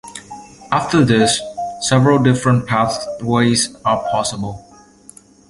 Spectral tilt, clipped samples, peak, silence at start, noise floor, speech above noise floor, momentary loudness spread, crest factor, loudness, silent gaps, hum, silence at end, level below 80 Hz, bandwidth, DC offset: -5 dB/octave; under 0.1%; -2 dBFS; 0.05 s; -44 dBFS; 29 dB; 17 LU; 16 dB; -16 LUFS; none; none; 0.9 s; -48 dBFS; 11.5 kHz; under 0.1%